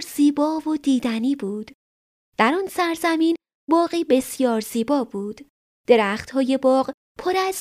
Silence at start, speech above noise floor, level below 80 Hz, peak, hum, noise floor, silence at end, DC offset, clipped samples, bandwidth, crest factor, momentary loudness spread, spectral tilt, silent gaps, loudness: 0 s; over 69 dB; -62 dBFS; -2 dBFS; none; under -90 dBFS; 0 s; under 0.1%; under 0.1%; 15.5 kHz; 18 dB; 12 LU; -4.5 dB/octave; 1.74-2.32 s, 3.54-3.67 s, 5.50-5.84 s, 6.94-7.15 s; -21 LUFS